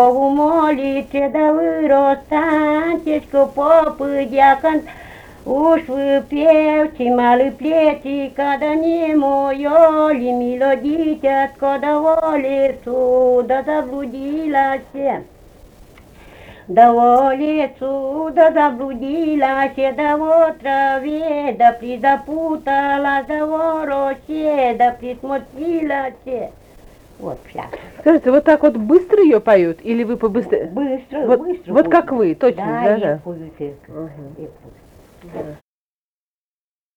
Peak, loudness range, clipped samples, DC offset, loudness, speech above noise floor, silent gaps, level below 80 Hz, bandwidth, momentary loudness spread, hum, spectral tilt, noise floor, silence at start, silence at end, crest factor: 0 dBFS; 6 LU; under 0.1%; under 0.1%; -16 LUFS; over 74 dB; none; -48 dBFS; 9.8 kHz; 14 LU; none; -7 dB/octave; under -90 dBFS; 0 s; 1.4 s; 16 dB